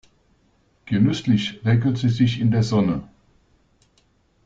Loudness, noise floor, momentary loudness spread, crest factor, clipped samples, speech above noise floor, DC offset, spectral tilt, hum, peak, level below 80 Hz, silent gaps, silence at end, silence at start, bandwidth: -21 LUFS; -62 dBFS; 4 LU; 16 dB; under 0.1%; 43 dB; under 0.1%; -7 dB/octave; none; -6 dBFS; -50 dBFS; none; 1.4 s; 0.85 s; 7.6 kHz